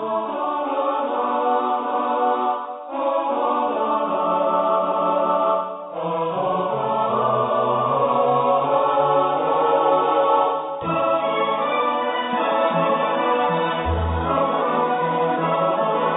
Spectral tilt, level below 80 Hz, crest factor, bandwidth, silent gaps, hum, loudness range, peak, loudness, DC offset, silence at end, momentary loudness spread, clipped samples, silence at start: -10.5 dB/octave; -42 dBFS; 14 dB; 4 kHz; none; none; 3 LU; -6 dBFS; -20 LUFS; under 0.1%; 0 s; 5 LU; under 0.1%; 0 s